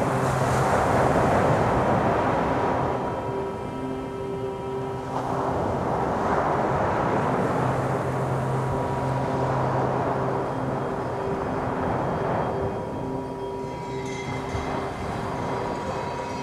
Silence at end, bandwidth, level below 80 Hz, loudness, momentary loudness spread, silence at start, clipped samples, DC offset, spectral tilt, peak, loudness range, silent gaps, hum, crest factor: 0 s; 13.5 kHz; -44 dBFS; -26 LUFS; 9 LU; 0 s; under 0.1%; under 0.1%; -7 dB/octave; -8 dBFS; 6 LU; none; none; 16 dB